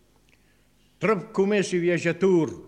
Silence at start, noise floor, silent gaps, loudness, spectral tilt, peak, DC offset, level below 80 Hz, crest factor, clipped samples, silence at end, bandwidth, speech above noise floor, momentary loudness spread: 1 s; -62 dBFS; none; -24 LUFS; -6 dB/octave; -10 dBFS; under 0.1%; -66 dBFS; 14 dB; under 0.1%; 0.05 s; 10.5 kHz; 39 dB; 4 LU